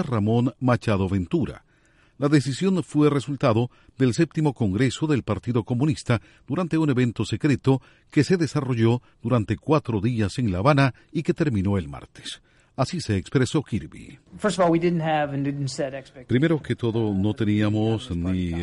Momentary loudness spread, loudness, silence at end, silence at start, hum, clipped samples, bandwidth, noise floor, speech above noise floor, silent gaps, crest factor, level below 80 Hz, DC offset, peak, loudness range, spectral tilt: 7 LU; -24 LUFS; 0 s; 0 s; none; under 0.1%; 11.5 kHz; -59 dBFS; 36 dB; none; 18 dB; -50 dBFS; under 0.1%; -4 dBFS; 2 LU; -7 dB/octave